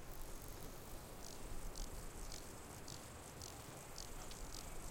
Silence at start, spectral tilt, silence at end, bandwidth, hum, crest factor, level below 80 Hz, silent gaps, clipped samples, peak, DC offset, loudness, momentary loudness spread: 0 s; -3.5 dB/octave; 0 s; 17 kHz; none; 16 dB; -54 dBFS; none; under 0.1%; -34 dBFS; under 0.1%; -52 LUFS; 2 LU